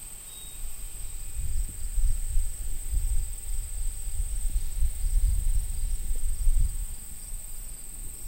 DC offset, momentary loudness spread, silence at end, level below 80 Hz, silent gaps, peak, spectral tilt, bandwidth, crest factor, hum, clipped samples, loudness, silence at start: under 0.1%; 9 LU; 0 s; -28 dBFS; none; -10 dBFS; -3 dB/octave; 16.5 kHz; 16 dB; none; under 0.1%; -34 LUFS; 0 s